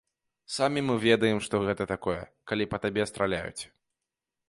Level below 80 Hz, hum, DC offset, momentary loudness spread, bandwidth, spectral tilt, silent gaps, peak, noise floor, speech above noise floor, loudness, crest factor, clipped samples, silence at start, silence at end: -56 dBFS; none; under 0.1%; 13 LU; 11.5 kHz; -5 dB/octave; none; -8 dBFS; -87 dBFS; 59 dB; -28 LUFS; 22 dB; under 0.1%; 0.5 s; 0.85 s